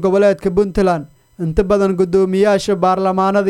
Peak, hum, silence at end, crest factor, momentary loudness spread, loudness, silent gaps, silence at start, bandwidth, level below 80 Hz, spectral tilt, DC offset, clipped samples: 0 dBFS; none; 0 s; 14 dB; 5 LU; -15 LUFS; none; 0 s; 12 kHz; -34 dBFS; -7 dB/octave; under 0.1%; under 0.1%